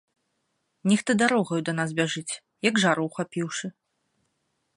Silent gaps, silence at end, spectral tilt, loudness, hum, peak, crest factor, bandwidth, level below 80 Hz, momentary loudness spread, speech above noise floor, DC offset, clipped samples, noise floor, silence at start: none; 1.05 s; -4.5 dB/octave; -25 LUFS; none; -6 dBFS; 22 dB; 11.5 kHz; -72 dBFS; 10 LU; 51 dB; under 0.1%; under 0.1%; -76 dBFS; 0.85 s